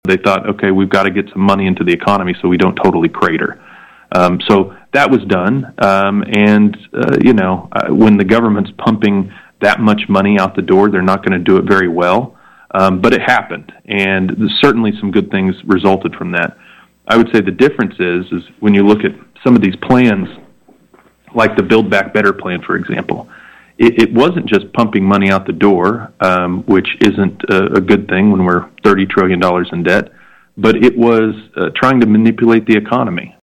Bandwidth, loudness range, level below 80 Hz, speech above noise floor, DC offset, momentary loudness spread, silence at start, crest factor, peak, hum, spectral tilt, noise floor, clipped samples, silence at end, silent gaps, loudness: 10.5 kHz; 2 LU; -48 dBFS; 37 dB; under 0.1%; 8 LU; 0.05 s; 12 dB; 0 dBFS; none; -7 dB/octave; -48 dBFS; under 0.1%; 0.2 s; none; -12 LUFS